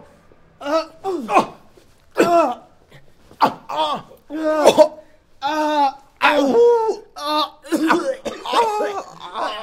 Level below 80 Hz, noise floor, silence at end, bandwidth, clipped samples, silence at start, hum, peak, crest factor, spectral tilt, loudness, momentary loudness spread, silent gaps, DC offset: -58 dBFS; -50 dBFS; 0 s; 16 kHz; under 0.1%; 0.6 s; none; 0 dBFS; 20 dB; -3.5 dB/octave; -19 LUFS; 14 LU; none; under 0.1%